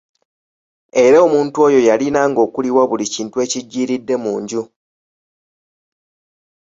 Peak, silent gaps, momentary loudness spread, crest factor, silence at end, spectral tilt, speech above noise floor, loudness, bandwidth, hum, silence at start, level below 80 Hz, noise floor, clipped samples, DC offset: -2 dBFS; none; 10 LU; 16 dB; 2 s; -4.5 dB/octave; over 76 dB; -15 LUFS; 8 kHz; none; 0.95 s; -60 dBFS; under -90 dBFS; under 0.1%; under 0.1%